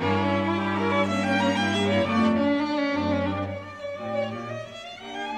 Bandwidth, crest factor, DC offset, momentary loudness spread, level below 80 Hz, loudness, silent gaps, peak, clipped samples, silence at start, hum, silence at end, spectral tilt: 11 kHz; 14 dB; under 0.1%; 13 LU; -62 dBFS; -25 LUFS; none; -10 dBFS; under 0.1%; 0 s; none; 0 s; -6 dB/octave